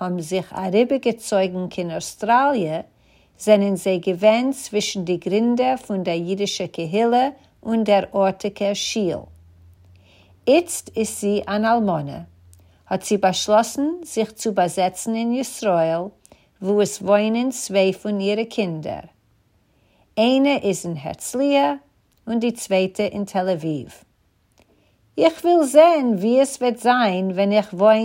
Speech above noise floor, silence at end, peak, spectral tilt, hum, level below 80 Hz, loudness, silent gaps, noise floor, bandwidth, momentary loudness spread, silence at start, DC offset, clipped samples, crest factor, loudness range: 43 dB; 0 s; 0 dBFS; -5 dB/octave; none; -62 dBFS; -20 LUFS; none; -62 dBFS; 16 kHz; 10 LU; 0 s; under 0.1%; under 0.1%; 20 dB; 4 LU